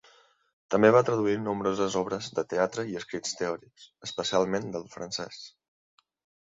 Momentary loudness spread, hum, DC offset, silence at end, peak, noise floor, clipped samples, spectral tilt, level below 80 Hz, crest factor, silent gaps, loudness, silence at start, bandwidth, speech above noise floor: 16 LU; none; under 0.1%; 1 s; -6 dBFS; -61 dBFS; under 0.1%; -4.5 dB/octave; -66 dBFS; 24 dB; none; -28 LUFS; 0.7 s; 7.8 kHz; 33 dB